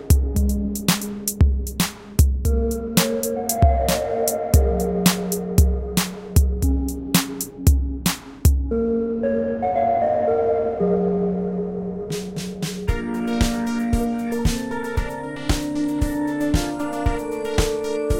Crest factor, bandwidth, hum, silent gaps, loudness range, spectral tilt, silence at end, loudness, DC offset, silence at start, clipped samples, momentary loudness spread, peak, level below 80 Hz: 18 dB; 17 kHz; none; none; 4 LU; -5.5 dB/octave; 0 s; -22 LUFS; under 0.1%; 0 s; under 0.1%; 7 LU; -2 dBFS; -26 dBFS